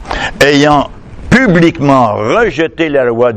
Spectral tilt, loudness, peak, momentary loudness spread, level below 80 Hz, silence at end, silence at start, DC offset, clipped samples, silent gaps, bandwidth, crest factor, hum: -6 dB/octave; -9 LUFS; 0 dBFS; 6 LU; -30 dBFS; 0 s; 0 s; under 0.1%; 0.9%; none; 13.5 kHz; 10 dB; none